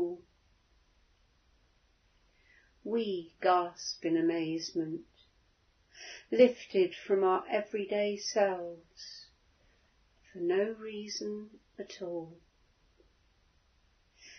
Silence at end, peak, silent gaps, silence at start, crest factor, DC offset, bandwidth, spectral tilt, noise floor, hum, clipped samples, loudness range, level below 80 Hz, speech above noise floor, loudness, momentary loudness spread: 0 s; -10 dBFS; none; 0 s; 24 dB; under 0.1%; 6.4 kHz; -3.5 dB/octave; -70 dBFS; none; under 0.1%; 12 LU; -72 dBFS; 38 dB; -32 LUFS; 19 LU